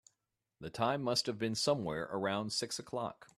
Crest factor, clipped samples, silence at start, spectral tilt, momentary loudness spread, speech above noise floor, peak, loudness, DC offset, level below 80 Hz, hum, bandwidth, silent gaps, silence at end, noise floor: 20 dB; under 0.1%; 0.6 s; -4 dB/octave; 8 LU; 50 dB; -18 dBFS; -35 LUFS; under 0.1%; -70 dBFS; none; 14.5 kHz; none; 0.15 s; -86 dBFS